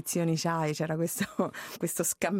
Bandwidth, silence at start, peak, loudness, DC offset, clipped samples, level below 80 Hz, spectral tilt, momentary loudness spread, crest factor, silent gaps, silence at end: 16.5 kHz; 0 s; -12 dBFS; -31 LUFS; under 0.1%; under 0.1%; -68 dBFS; -4.5 dB/octave; 5 LU; 18 dB; none; 0 s